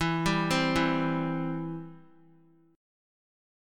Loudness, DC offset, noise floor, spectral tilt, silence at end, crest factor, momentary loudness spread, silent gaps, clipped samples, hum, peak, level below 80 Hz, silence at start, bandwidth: -28 LUFS; under 0.1%; -61 dBFS; -5.5 dB/octave; 1.75 s; 18 dB; 13 LU; none; under 0.1%; none; -12 dBFS; -52 dBFS; 0 s; 15.5 kHz